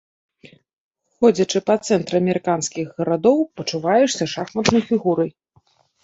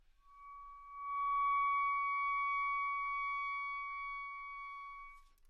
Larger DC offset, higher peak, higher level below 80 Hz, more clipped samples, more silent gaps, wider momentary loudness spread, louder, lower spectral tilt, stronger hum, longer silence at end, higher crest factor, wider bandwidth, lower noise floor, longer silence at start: neither; first, -2 dBFS vs -28 dBFS; first, -58 dBFS vs -66 dBFS; neither; neither; second, 7 LU vs 20 LU; first, -19 LUFS vs -37 LUFS; first, -5 dB/octave vs 0 dB/octave; neither; first, 0.75 s vs 0.25 s; first, 18 dB vs 12 dB; first, 8 kHz vs 6 kHz; about the same, -60 dBFS vs -59 dBFS; first, 1.2 s vs 0.3 s